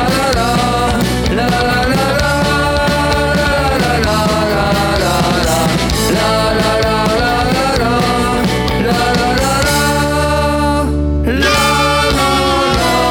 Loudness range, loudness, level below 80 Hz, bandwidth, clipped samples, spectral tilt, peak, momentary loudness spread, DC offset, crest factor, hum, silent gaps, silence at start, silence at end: 1 LU; -13 LUFS; -24 dBFS; 19.5 kHz; under 0.1%; -4.5 dB/octave; -2 dBFS; 2 LU; under 0.1%; 10 dB; none; none; 0 s; 0 s